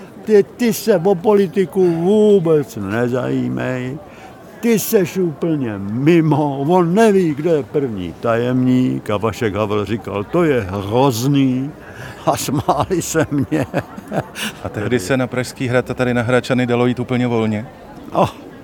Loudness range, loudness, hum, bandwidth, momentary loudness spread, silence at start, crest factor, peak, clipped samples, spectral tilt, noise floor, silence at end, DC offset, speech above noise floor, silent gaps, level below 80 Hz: 4 LU; -17 LUFS; none; 19 kHz; 10 LU; 0 s; 16 dB; 0 dBFS; under 0.1%; -6 dB/octave; -37 dBFS; 0 s; under 0.1%; 21 dB; none; -48 dBFS